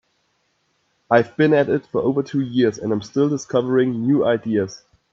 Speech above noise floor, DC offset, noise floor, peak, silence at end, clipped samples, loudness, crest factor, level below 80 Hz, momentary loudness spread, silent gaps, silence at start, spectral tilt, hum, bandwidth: 49 dB; under 0.1%; -67 dBFS; 0 dBFS; 0.35 s; under 0.1%; -20 LUFS; 20 dB; -62 dBFS; 6 LU; none; 1.1 s; -7 dB/octave; none; 7.6 kHz